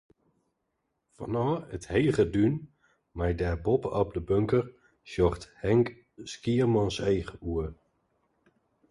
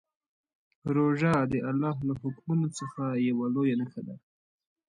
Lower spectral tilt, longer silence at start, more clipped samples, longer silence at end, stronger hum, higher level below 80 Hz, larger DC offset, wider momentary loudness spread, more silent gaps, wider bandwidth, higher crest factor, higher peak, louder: about the same, -7.5 dB/octave vs -7.5 dB/octave; first, 1.2 s vs 0.85 s; neither; first, 1.15 s vs 0.7 s; neither; first, -46 dBFS vs -62 dBFS; neither; about the same, 13 LU vs 13 LU; neither; about the same, 11.5 kHz vs 11 kHz; about the same, 18 dB vs 16 dB; about the same, -12 dBFS vs -14 dBFS; about the same, -29 LUFS vs -29 LUFS